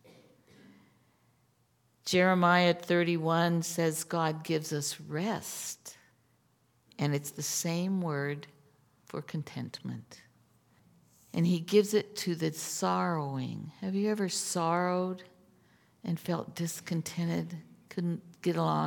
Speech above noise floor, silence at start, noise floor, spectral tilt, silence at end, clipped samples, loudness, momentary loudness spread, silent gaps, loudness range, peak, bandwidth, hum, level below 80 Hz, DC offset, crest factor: 40 dB; 0.7 s; -71 dBFS; -5 dB/octave; 0 s; under 0.1%; -31 LUFS; 14 LU; none; 8 LU; -10 dBFS; 18 kHz; none; -80 dBFS; under 0.1%; 22 dB